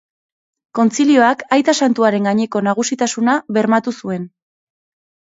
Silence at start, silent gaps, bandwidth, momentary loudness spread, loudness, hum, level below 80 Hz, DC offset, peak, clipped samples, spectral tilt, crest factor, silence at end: 0.75 s; none; 8 kHz; 12 LU; -15 LUFS; none; -66 dBFS; under 0.1%; 0 dBFS; under 0.1%; -4.5 dB/octave; 16 dB; 1.05 s